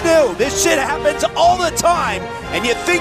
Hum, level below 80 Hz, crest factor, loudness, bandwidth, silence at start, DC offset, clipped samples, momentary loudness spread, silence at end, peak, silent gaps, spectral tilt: none; -38 dBFS; 14 dB; -16 LUFS; 16 kHz; 0 s; under 0.1%; under 0.1%; 6 LU; 0 s; -2 dBFS; none; -3 dB/octave